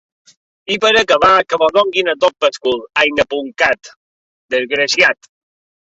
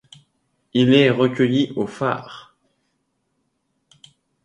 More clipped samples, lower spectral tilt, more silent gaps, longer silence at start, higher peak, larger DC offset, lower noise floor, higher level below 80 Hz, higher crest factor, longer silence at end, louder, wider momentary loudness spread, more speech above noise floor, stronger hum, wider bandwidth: neither; second, -2 dB/octave vs -7 dB/octave; first, 3.96-4.49 s vs none; about the same, 0.7 s vs 0.75 s; about the same, 0 dBFS vs -2 dBFS; neither; first, under -90 dBFS vs -71 dBFS; first, -52 dBFS vs -64 dBFS; about the same, 16 dB vs 20 dB; second, 0.8 s vs 2.05 s; first, -14 LUFS vs -19 LUFS; about the same, 10 LU vs 12 LU; first, over 76 dB vs 53 dB; neither; second, 8 kHz vs 9 kHz